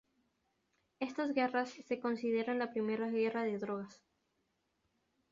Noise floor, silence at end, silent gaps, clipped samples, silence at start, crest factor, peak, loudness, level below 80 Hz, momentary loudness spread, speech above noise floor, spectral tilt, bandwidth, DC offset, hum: -81 dBFS; 1.4 s; none; under 0.1%; 1 s; 18 dB; -20 dBFS; -37 LUFS; -82 dBFS; 8 LU; 45 dB; -4 dB/octave; 7.4 kHz; under 0.1%; none